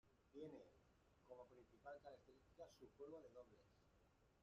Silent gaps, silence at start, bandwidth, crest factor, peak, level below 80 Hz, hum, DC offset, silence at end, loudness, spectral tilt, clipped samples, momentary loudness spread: none; 0.05 s; 7.4 kHz; 18 dB; -46 dBFS; -84 dBFS; none; under 0.1%; 0 s; -63 LUFS; -5.5 dB/octave; under 0.1%; 7 LU